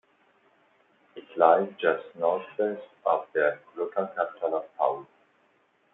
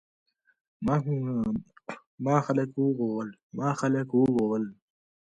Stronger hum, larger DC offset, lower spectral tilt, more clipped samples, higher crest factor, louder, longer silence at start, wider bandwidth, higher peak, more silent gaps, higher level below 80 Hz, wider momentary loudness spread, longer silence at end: neither; neither; about the same, -8 dB/octave vs -8 dB/octave; neither; about the same, 24 dB vs 20 dB; about the same, -27 LUFS vs -28 LUFS; first, 1.15 s vs 0.8 s; second, 4 kHz vs 9.6 kHz; first, -6 dBFS vs -10 dBFS; second, none vs 2.07-2.18 s, 3.43-3.50 s; second, -82 dBFS vs -62 dBFS; about the same, 11 LU vs 13 LU; first, 0.9 s vs 0.5 s